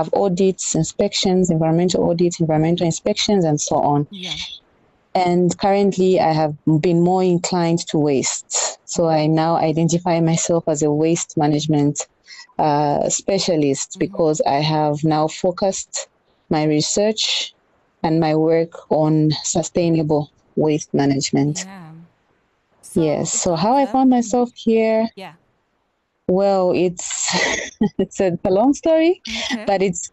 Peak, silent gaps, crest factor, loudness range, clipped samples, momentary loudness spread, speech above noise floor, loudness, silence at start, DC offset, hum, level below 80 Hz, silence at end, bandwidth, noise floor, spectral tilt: -6 dBFS; none; 12 dB; 3 LU; under 0.1%; 6 LU; 51 dB; -18 LUFS; 0 s; under 0.1%; none; -52 dBFS; 0.05 s; 11 kHz; -68 dBFS; -5 dB/octave